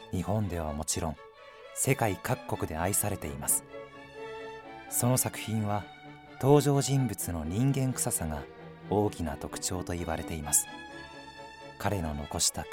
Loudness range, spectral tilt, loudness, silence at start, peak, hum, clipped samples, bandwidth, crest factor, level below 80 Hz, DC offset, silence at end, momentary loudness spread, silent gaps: 4 LU; -4.5 dB/octave; -30 LUFS; 0 s; -10 dBFS; none; under 0.1%; 17 kHz; 22 dB; -50 dBFS; under 0.1%; 0 s; 19 LU; none